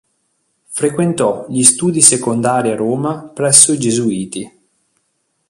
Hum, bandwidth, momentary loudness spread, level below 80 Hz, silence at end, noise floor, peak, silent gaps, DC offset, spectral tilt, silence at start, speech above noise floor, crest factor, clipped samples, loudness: none; 16 kHz; 15 LU; -56 dBFS; 1 s; -66 dBFS; 0 dBFS; none; under 0.1%; -3.5 dB/octave; 0.7 s; 53 dB; 16 dB; 0.3%; -12 LUFS